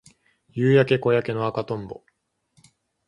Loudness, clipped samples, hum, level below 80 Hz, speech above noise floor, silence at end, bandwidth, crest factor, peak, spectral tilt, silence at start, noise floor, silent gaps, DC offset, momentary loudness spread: -22 LUFS; under 0.1%; none; -60 dBFS; 47 dB; 1.15 s; 11 kHz; 20 dB; -4 dBFS; -8 dB/octave; 0.55 s; -68 dBFS; none; under 0.1%; 19 LU